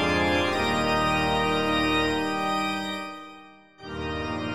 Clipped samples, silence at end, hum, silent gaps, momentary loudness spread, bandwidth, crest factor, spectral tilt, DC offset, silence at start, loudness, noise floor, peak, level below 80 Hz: under 0.1%; 0 s; none; none; 15 LU; 16.5 kHz; 14 dB; -4.5 dB/octave; 0.5%; 0 s; -25 LUFS; -49 dBFS; -12 dBFS; -44 dBFS